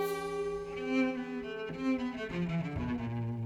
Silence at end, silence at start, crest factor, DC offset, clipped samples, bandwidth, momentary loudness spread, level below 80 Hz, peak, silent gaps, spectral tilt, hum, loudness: 0 s; 0 s; 16 dB; under 0.1%; under 0.1%; 17 kHz; 7 LU; -54 dBFS; -18 dBFS; none; -7 dB/octave; none; -35 LUFS